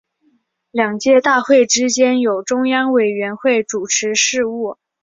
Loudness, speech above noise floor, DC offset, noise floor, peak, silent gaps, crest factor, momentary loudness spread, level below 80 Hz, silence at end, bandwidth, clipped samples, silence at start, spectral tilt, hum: -15 LUFS; 46 dB; under 0.1%; -61 dBFS; -2 dBFS; none; 14 dB; 7 LU; -64 dBFS; 0.3 s; 7.8 kHz; under 0.1%; 0.75 s; -2 dB/octave; none